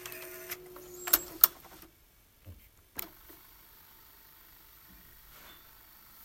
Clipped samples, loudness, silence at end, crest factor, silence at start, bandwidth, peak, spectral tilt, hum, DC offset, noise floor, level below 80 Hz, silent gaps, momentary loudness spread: under 0.1%; -29 LUFS; 0 s; 38 dB; 0 s; 16.5 kHz; 0 dBFS; -1 dB/octave; none; under 0.1%; -63 dBFS; -64 dBFS; none; 30 LU